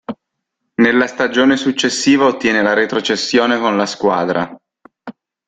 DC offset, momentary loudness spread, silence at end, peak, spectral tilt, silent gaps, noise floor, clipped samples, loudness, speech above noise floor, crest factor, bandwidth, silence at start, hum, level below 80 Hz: under 0.1%; 8 LU; 0.35 s; -2 dBFS; -3.5 dB/octave; none; -75 dBFS; under 0.1%; -14 LUFS; 61 dB; 14 dB; 9.2 kHz; 0.1 s; none; -58 dBFS